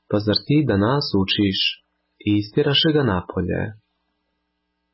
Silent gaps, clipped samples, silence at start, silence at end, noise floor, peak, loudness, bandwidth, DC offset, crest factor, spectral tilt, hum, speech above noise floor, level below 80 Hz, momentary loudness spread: none; under 0.1%; 0.1 s; 1.2 s; -74 dBFS; -6 dBFS; -20 LUFS; 5.8 kHz; under 0.1%; 16 dB; -10 dB/octave; none; 55 dB; -44 dBFS; 9 LU